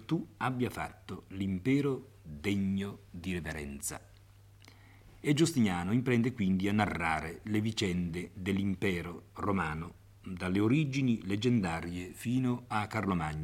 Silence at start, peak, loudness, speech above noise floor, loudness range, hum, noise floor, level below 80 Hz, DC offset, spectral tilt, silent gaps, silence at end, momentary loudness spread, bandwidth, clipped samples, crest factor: 0 s; -12 dBFS; -33 LUFS; 25 dB; 4 LU; none; -57 dBFS; -58 dBFS; under 0.1%; -6 dB/octave; none; 0 s; 12 LU; 16.5 kHz; under 0.1%; 20 dB